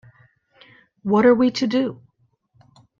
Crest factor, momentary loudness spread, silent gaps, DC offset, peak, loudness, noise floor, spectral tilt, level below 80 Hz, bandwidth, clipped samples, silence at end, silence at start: 18 dB; 12 LU; none; under 0.1%; -4 dBFS; -19 LUFS; -65 dBFS; -6 dB/octave; -62 dBFS; 7.4 kHz; under 0.1%; 1.05 s; 1.05 s